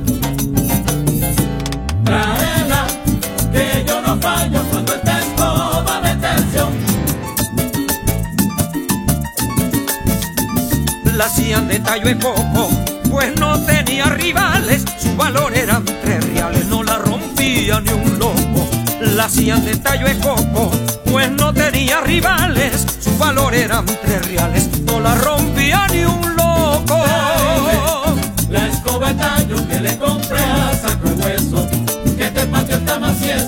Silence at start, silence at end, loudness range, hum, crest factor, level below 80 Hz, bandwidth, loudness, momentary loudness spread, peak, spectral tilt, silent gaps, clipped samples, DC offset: 0 s; 0 s; 2 LU; none; 16 dB; -26 dBFS; 17.5 kHz; -15 LUFS; 4 LU; 0 dBFS; -4.5 dB/octave; none; under 0.1%; under 0.1%